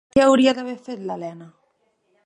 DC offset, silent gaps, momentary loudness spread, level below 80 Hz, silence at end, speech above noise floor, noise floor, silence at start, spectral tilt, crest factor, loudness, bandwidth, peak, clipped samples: under 0.1%; none; 17 LU; -54 dBFS; 0.75 s; 48 dB; -67 dBFS; 0.15 s; -4.5 dB/octave; 18 dB; -20 LUFS; 10 kHz; -4 dBFS; under 0.1%